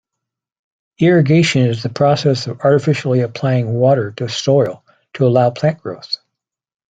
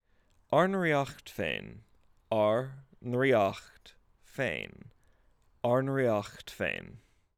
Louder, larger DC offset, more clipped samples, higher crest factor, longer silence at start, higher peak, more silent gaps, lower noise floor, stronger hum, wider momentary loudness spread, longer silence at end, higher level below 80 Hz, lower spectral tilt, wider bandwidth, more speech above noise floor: first, -15 LUFS vs -31 LUFS; neither; neither; second, 14 dB vs 20 dB; first, 1 s vs 0.5 s; first, -2 dBFS vs -12 dBFS; neither; first, -81 dBFS vs -67 dBFS; neither; second, 9 LU vs 17 LU; first, 0.75 s vs 0.4 s; first, -56 dBFS vs -64 dBFS; about the same, -6.5 dB/octave vs -6.5 dB/octave; second, 9 kHz vs 16 kHz; first, 66 dB vs 37 dB